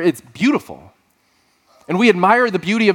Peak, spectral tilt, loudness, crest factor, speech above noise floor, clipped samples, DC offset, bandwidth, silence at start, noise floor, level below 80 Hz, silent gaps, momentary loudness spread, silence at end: 0 dBFS; -5.5 dB/octave; -16 LUFS; 16 dB; 45 dB; under 0.1%; under 0.1%; 17 kHz; 0 s; -60 dBFS; -62 dBFS; none; 10 LU; 0 s